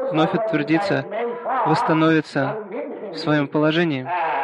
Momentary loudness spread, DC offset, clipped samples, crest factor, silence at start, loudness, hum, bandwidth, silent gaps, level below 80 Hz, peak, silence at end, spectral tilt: 10 LU; under 0.1%; under 0.1%; 14 dB; 0 s; -21 LUFS; none; 10 kHz; none; -64 dBFS; -6 dBFS; 0 s; -7 dB/octave